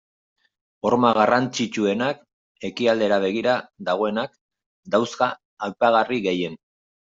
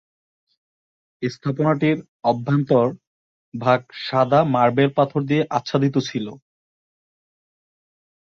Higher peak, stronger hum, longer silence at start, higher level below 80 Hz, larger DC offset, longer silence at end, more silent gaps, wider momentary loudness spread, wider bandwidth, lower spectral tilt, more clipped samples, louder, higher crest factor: about the same, -4 dBFS vs -2 dBFS; neither; second, 0.85 s vs 1.2 s; about the same, -66 dBFS vs -62 dBFS; neither; second, 0.6 s vs 1.9 s; about the same, 2.33-2.55 s, 4.41-4.49 s, 4.66-4.83 s, 5.45-5.57 s vs 2.08-2.20 s, 3.07-3.52 s; about the same, 13 LU vs 11 LU; first, 7.8 kHz vs 7 kHz; second, -5 dB/octave vs -7.5 dB/octave; neither; about the same, -22 LUFS vs -20 LUFS; about the same, 20 dB vs 20 dB